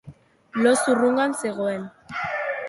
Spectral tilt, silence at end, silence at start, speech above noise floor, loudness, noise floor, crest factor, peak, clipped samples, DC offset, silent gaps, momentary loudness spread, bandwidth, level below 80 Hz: -4 dB/octave; 0 s; 0.05 s; 26 dB; -23 LUFS; -47 dBFS; 18 dB; -6 dBFS; under 0.1%; under 0.1%; none; 13 LU; 12 kHz; -64 dBFS